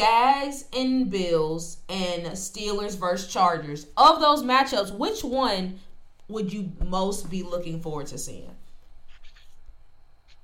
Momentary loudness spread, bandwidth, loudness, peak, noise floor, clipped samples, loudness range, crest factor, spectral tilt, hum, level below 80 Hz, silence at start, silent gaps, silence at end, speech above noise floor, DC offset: 15 LU; 16.5 kHz; -25 LUFS; -6 dBFS; -48 dBFS; under 0.1%; 11 LU; 20 dB; -4 dB/octave; none; -42 dBFS; 0 s; none; 0.05 s; 24 dB; under 0.1%